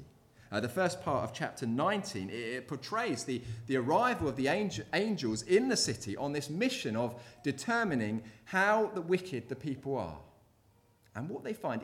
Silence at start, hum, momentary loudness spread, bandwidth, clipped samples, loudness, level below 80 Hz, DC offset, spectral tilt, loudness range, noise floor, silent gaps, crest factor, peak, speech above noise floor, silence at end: 0 s; none; 11 LU; 16.5 kHz; under 0.1%; -33 LUFS; -64 dBFS; under 0.1%; -4.5 dB/octave; 3 LU; -67 dBFS; none; 18 dB; -16 dBFS; 34 dB; 0 s